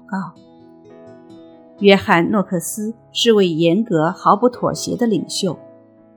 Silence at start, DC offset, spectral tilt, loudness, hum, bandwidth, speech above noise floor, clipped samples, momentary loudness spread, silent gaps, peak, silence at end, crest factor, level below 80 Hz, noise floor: 0.1 s; under 0.1%; -5 dB/octave; -17 LUFS; none; 19 kHz; 29 dB; under 0.1%; 12 LU; none; 0 dBFS; 0.55 s; 18 dB; -60 dBFS; -46 dBFS